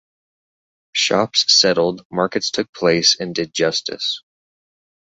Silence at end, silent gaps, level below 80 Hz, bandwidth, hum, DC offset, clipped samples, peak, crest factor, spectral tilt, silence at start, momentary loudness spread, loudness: 0.95 s; 2.05-2.10 s, 2.69-2.73 s; -60 dBFS; 8.2 kHz; none; under 0.1%; under 0.1%; 0 dBFS; 20 dB; -2.5 dB/octave; 0.95 s; 11 LU; -17 LUFS